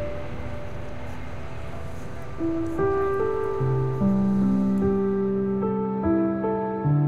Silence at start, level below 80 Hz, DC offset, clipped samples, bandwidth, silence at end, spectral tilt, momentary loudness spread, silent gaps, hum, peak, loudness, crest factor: 0 s; -42 dBFS; 2%; under 0.1%; 7.4 kHz; 0 s; -9.5 dB/octave; 15 LU; none; none; -12 dBFS; -25 LUFS; 12 dB